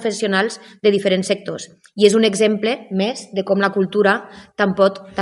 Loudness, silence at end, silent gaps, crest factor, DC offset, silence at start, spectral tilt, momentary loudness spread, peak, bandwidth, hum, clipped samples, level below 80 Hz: -18 LUFS; 0 s; none; 18 dB; under 0.1%; 0 s; -4.5 dB/octave; 9 LU; 0 dBFS; 12 kHz; none; under 0.1%; -64 dBFS